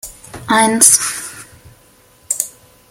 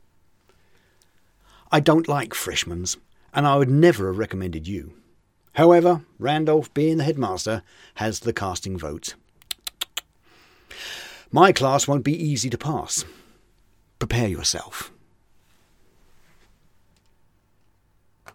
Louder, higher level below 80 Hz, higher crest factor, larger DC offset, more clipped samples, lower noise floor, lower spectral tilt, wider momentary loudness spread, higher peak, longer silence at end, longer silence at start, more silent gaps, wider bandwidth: first, -12 LUFS vs -22 LUFS; about the same, -52 dBFS vs -48 dBFS; second, 18 dB vs 24 dB; neither; first, 0.1% vs under 0.1%; second, -49 dBFS vs -62 dBFS; second, -1 dB/octave vs -5 dB/octave; first, 22 LU vs 18 LU; about the same, 0 dBFS vs 0 dBFS; second, 0.4 s vs 3.45 s; second, 0.05 s vs 1.7 s; neither; first, over 20 kHz vs 17 kHz